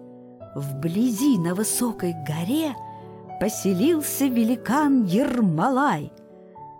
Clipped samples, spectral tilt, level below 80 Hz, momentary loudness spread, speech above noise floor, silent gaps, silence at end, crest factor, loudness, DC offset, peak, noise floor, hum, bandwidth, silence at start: under 0.1%; -5.5 dB/octave; -60 dBFS; 17 LU; 21 dB; none; 0 s; 12 dB; -23 LUFS; under 0.1%; -12 dBFS; -43 dBFS; none; 17 kHz; 0 s